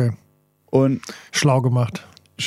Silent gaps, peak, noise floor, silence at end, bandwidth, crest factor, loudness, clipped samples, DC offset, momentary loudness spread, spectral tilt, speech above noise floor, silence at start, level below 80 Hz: none; -4 dBFS; -60 dBFS; 0 s; 13.5 kHz; 18 dB; -20 LUFS; under 0.1%; under 0.1%; 13 LU; -5.5 dB/octave; 41 dB; 0 s; -64 dBFS